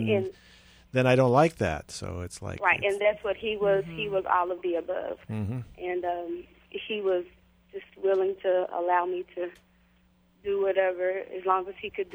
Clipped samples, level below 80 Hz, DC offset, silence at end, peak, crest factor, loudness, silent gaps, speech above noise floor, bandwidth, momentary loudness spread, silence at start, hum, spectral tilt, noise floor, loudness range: under 0.1%; -56 dBFS; under 0.1%; 0 s; -8 dBFS; 20 dB; -28 LUFS; none; 36 dB; over 20 kHz; 14 LU; 0 s; none; -6 dB/octave; -63 dBFS; 5 LU